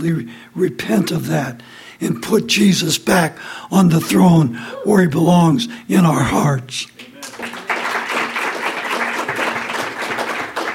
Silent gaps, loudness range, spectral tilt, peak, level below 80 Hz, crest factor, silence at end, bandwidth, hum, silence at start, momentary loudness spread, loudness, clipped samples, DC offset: none; 6 LU; -5.5 dB/octave; -2 dBFS; -50 dBFS; 16 dB; 0 s; 16.5 kHz; none; 0 s; 13 LU; -17 LUFS; under 0.1%; under 0.1%